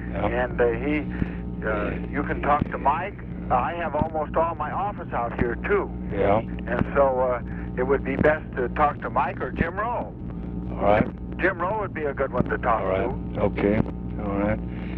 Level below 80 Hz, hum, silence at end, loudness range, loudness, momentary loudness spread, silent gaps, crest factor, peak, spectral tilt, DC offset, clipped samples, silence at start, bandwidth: -36 dBFS; 60 Hz at -40 dBFS; 0 s; 2 LU; -25 LUFS; 8 LU; none; 18 dB; -6 dBFS; -10 dB/octave; under 0.1%; under 0.1%; 0 s; 4.8 kHz